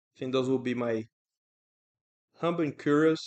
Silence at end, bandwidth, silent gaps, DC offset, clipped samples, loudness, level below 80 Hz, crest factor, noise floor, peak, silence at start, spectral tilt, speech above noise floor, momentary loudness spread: 0 s; 8.6 kHz; 1.12-1.25 s, 1.37-1.95 s, 2.01-2.28 s; under 0.1%; under 0.1%; -29 LUFS; -78 dBFS; 18 dB; under -90 dBFS; -12 dBFS; 0.2 s; -6.5 dB/octave; over 62 dB; 9 LU